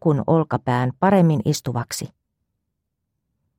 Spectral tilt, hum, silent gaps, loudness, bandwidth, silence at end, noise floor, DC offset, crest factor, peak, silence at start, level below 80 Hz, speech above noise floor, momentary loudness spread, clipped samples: -6.5 dB/octave; none; none; -20 LUFS; 16 kHz; 1.5 s; -78 dBFS; under 0.1%; 16 dB; -4 dBFS; 0.05 s; -58 dBFS; 58 dB; 13 LU; under 0.1%